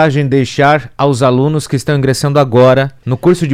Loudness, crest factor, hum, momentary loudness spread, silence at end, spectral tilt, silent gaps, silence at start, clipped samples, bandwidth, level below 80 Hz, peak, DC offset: -11 LUFS; 10 dB; none; 6 LU; 0 s; -6.5 dB/octave; none; 0 s; under 0.1%; 14 kHz; -42 dBFS; 0 dBFS; under 0.1%